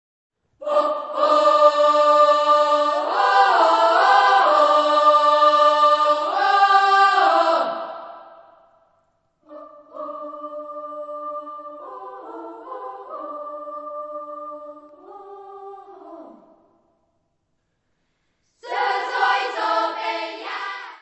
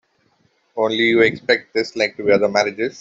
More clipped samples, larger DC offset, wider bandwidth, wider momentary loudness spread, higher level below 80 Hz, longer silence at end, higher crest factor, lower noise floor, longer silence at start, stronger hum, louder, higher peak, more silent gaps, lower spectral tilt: neither; neither; about the same, 8.4 kHz vs 7.8 kHz; first, 21 LU vs 8 LU; second, -78 dBFS vs -60 dBFS; about the same, 0.05 s vs 0 s; about the same, 18 dB vs 16 dB; first, -72 dBFS vs -62 dBFS; second, 0.6 s vs 0.75 s; neither; about the same, -17 LUFS vs -18 LUFS; about the same, -2 dBFS vs -2 dBFS; neither; second, -1 dB/octave vs -4.5 dB/octave